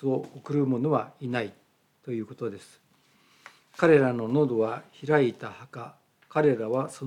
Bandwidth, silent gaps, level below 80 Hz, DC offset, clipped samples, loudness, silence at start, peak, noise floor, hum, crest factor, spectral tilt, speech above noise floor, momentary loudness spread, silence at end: 11.5 kHz; none; -78 dBFS; under 0.1%; under 0.1%; -27 LUFS; 0 s; -8 dBFS; -63 dBFS; none; 20 dB; -7.5 dB/octave; 37 dB; 20 LU; 0 s